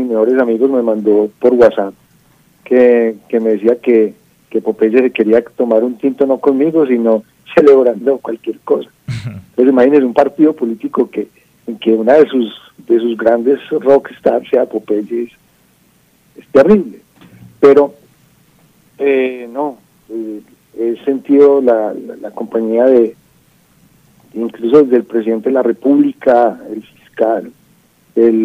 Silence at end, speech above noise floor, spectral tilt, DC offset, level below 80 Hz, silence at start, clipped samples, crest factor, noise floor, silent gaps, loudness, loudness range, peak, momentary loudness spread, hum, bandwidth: 0 s; 41 dB; -8 dB/octave; under 0.1%; -54 dBFS; 0 s; 0.2%; 12 dB; -52 dBFS; none; -12 LUFS; 3 LU; 0 dBFS; 15 LU; none; 7 kHz